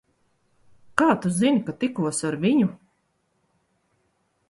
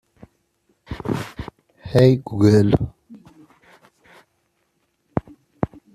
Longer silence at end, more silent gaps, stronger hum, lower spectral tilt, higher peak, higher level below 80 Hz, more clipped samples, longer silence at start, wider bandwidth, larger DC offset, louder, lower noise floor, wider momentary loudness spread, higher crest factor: first, 1.75 s vs 0.3 s; neither; neither; second, -5.5 dB/octave vs -8 dB/octave; about the same, -2 dBFS vs -2 dBFS; second, -64 dBFS vs -46 dBFS; neither; about the same, 0.95 s vs 0.9 s; second, 11.5 kHz vs 13.5 kHz; neither; second, -23 LUFS vs -20 LUFS; about the same, -71 dBFS vs -69 dBFS; second, 6 LU vs 22 LU; about the same, 24 dB vs 20 dB